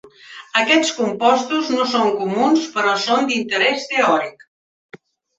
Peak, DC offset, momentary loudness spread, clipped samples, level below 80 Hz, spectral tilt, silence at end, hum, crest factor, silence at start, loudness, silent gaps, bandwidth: -2 dBFS; under 0.1%; 5 LU; under 0.1%; -68 dBFS; -3 dB/octave; 0.4 s; none; 18 dB; 0.05 s; -17 LUFS; 4.48-4.89 s; 8.2 kHz